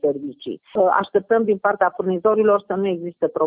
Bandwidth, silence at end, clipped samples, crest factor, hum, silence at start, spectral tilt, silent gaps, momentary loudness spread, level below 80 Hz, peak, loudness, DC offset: 4 kHz; 0 s; under 0.1%; 16 dB; none; 0.05 s; -10.5 dB/octave; none; 9 LU; -64 dBFS; -4 dBFS; -20 LUFS; under 0.1%